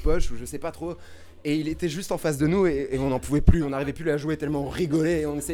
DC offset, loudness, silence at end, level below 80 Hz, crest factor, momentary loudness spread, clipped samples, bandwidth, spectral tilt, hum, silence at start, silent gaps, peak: under 0.1%; -26 LUFS; 0 s; -32 dBFS; 22 dB; 12 LU; under 0.1%; 16.5 kHz; -6.5 dB/octave; none; 0 s; none; -2 dBFS